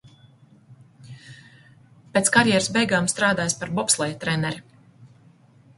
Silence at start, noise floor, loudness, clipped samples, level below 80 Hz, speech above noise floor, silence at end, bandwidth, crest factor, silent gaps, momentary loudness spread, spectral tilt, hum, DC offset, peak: 0.7 s; -54 dBFS; -21 LUFS; under 0.1%; -58 dBFS; 32 dB; 0.7 s; 12 kHz; 24 dB; none; 13 LU; -3 dB/octave; none; under 0.1%; -2 dBFS